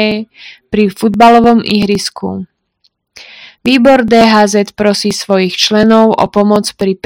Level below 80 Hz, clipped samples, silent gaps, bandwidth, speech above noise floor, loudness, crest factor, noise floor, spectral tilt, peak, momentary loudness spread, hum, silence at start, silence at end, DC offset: -42 dBFS; 3%; none; 16.5 kHz; 49 dB; -9 LUFS; 10 dB; -58 dBFS; -4.5 dB/octave; 0 dBFS; 12 LU; none; 0 s; 0.1 s; under 0.1%